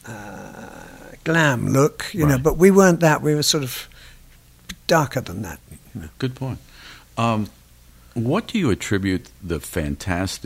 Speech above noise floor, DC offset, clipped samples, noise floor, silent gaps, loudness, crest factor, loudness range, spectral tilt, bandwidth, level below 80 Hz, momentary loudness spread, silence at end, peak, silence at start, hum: 29 dB; under 0.1%; under 0.1%; -49 dBFS; none; -20 LUFS; 20 dB; 9 LU; -5 dB/octave; 16 kHz; -42 dBFS; 22 LU; 0 s; -2 dBFS; 0.05 s; none